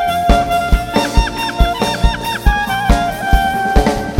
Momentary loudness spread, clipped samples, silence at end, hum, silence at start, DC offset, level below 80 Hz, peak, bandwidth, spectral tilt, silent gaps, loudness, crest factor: 3 LU; 0.2%; 0 s; none; 0 s; under 0.1%; -18 dBFS; 0 dBFS; 16.5 kHz; -5 dB/octave; none; -15 LUFS; 14 dB